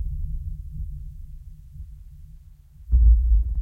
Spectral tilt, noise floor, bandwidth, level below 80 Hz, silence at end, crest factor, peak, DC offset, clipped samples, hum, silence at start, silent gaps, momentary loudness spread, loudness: -10.5 dB/octave; -47 dBFS; 0.4 kHz; -24 dBFS; 0 s; 16 dB; -6 dBFS; under 0.1%; under 0.1%; none; 0 s; none; 26 LU; -24 LUFS